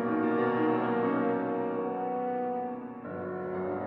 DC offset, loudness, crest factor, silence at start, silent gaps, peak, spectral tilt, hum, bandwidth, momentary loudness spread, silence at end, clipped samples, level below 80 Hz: under 0.1%; -31 LUFS; 14 dB; 0 s; none; -16 dBFS; -10 dB/octave; none; 4.9 kHz; 10 LU; 0 s; under 0.1%; -72 dBFS